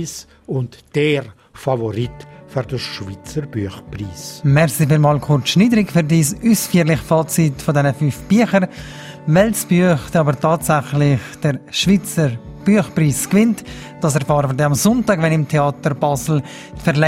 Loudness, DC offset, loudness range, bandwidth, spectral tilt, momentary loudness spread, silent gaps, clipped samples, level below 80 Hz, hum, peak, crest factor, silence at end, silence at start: -17 LUFS; under 0.1%; 7 LU; 16 kHz; -5.5 dB/octave; 12 LU; none; under 0.1%; -44 dBFS; none; 0 dBFS; 16 dB; 0 s; 0 s